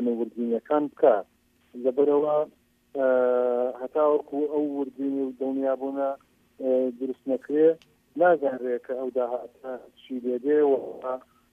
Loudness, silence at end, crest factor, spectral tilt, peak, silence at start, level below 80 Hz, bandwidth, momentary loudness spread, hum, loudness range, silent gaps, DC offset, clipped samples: -26 LUFS; 0.35 s; 18 dB; -8 dB/octave; -6 dBFS; 0 s; -76 dBFS; 3.7 kHz; 13 LU; none; 3 LU; none; under 0.1%; under 0.1%